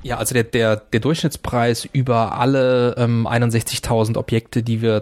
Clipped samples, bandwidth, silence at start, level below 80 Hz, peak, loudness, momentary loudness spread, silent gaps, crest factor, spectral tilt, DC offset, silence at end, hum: under 0.1%; 16 kHz; 0 s; -42 dBFS; -2 dBFS; -19 LUFS; 4 LU; none; 16 dB; -5.5 dB/octave; under 0.1%; 0 s; none